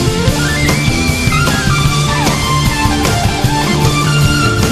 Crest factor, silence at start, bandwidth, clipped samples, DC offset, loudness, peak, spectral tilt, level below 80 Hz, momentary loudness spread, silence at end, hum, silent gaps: 12 dB; 0 s; 14 kHz; under 0.1%; under 0.1%; -12 LUFS; 0 dBFS; -4.5 dB/octave; -22 dBFS; 2 LU; 0 s; none; none